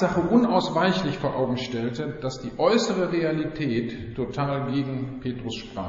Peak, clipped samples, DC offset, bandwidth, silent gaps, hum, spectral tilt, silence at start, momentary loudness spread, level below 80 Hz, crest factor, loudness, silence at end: -8 dBFS; under 0.1%; under 0.1%; 7.6 kHz; none; none; -5 dB/octave; 0 s; 11 LU; -50 dBFS; 18 dB; -25 LUFS; 0 s